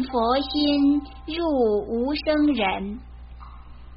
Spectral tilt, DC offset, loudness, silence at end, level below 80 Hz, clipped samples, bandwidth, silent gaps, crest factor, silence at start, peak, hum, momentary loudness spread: -3.5 dB/octave; under 0.1%; -23 LUFS; 0 s; -42 dBFS; under 0.1%; 5.4 kHz; none; 14 dB; 0 s; -8 dBFS; none; 14 LU